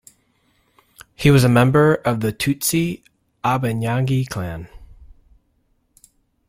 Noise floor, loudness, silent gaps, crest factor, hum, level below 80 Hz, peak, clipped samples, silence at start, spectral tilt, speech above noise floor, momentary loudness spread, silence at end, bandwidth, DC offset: -64 dBFS; -18 LUFS; none; 18 dB; none; -46 dBFS; -2 dBFS; under 0.1%; 1.2 s; -6 dB/octave; 47 dB; 13 LU; 1.35 s; 16.5 kHz; under 0.1%